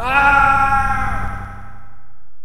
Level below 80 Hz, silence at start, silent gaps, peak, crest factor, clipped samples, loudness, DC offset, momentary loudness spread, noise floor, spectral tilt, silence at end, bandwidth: -30 dBFS; 0 s; none; 0 dBFS; 16 dB; under 0.1%; -15 LUFS; under 0.1%; 18 LU; -46 dBFS; -5 dB/octave; 0 s; 15 kHz